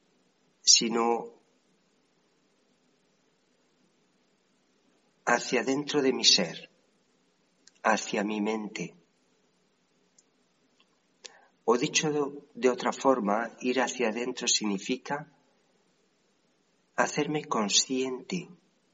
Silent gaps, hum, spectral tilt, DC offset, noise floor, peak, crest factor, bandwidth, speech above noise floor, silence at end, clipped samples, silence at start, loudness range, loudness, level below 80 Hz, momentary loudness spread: none; none; -2 dB/octave; under 0.1%; -70 dBFS; -6 dBFS; 26 dB; 8.2 kHz; 43 dB; 0.4 s; under 0.1%; 0.65 s; 9 LU; -27 LUFS; -82 dBFS; 16 LU